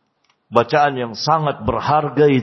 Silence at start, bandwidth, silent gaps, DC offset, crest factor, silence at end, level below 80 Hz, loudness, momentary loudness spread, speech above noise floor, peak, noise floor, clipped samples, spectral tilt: 0.5 s; 6.2 kHz; none; under 0.1%; 18 dB; 0 s; -46 dBFS; -18 LUFS; 6 LU; 48 dB; 0 dBFS; -64 dBFS; under 0.1%; -6.5 dB/octave